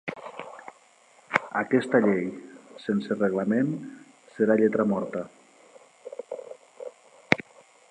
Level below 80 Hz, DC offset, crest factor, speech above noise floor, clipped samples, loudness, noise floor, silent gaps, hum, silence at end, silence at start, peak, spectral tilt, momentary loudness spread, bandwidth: -72 dBFS; under 0.1%; 28 dB; 33 dB; under 0.1%; -26 LUFS; -58 dBFS; none; none; 0.5 s; 0.05 s; 0 dBFS; -7 dB/octave; 22 LU; 10.5 kHz